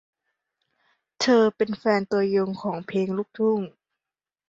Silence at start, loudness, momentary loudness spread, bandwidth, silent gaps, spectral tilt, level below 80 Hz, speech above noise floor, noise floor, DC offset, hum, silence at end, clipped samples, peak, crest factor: 1.2 s; -24 LUFS; 9 LU; 7.8 kHz; none; -5.5 dB/octave; -70 dBFS; over 67 dB; under -90 dBFS; under 0.1%; none; 0.8 s; under 0.1%; -8 dBFS; 16 dB